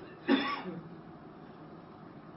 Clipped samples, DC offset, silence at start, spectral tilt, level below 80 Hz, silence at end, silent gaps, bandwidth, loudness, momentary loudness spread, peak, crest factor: under 0.1%; under 0.1%; 0 s; -3 dB/octave; -72 dBFS; 0 s; none; 5.8 kHz; -33 LUFS; 20 LU; -14 dBFS; 22 dB